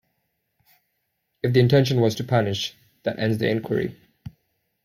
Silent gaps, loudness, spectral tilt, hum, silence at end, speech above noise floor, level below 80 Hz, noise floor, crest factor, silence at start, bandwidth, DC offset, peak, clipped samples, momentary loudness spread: none; -23 LUFS; -6.5 dB/octave; none; 0.55 s; 54 dB; -58 dBFS; -75 dBFS; 18 dB; 1.45 s; 15 kHz; under 0.1%; -6 dBFS; under 0.1%; 13 LU